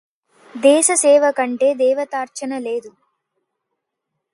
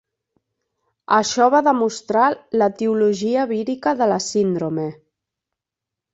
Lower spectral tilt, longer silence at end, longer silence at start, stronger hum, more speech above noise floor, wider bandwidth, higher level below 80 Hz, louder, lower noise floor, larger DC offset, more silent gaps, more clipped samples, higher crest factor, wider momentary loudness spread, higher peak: second, -1 dB/octave vs -4.5 dB/octave; first, 1.45 s vs 1.2 s; second, 0.55 s vs 1.1 s; neither; second, 62 dB vs 67 dB; first, 11.5 kHz vs 8.2 kHz; second, -76 dBFS vs -66 dBFS; first, -16 LUFS vs -19 LUFS; second, -78 dBFS vs -86 dBFS; neither; neither; neither; about the same, 18 dB vs 18 dB; first, 13 LU vs 7 LU; about the same, 0 dBFS vs -2 dBFS